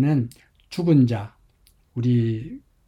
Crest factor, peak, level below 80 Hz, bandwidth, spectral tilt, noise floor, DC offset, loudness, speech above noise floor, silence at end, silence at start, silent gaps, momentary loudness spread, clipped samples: 16 dB; -6 dBFS; -56 dBFS; 11 kHz; -9 dB/octave; -59 dBFS; under 0.1%; -22 LUFS; 38 dB; 0.3 s; 0 s; none; 18 LU; under 0.1%